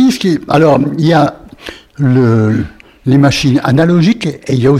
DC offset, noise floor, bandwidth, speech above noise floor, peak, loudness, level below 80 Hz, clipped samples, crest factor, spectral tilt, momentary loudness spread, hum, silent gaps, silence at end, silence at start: under 0.1%; -31 dBFS; 14 kHz; 22 dB; 0 dBFS; -11 LUFS; -40 dBFS; under 0.1%; 10 dB; -7 dB/octave; 15 LU; none; none; 0 s; 0 s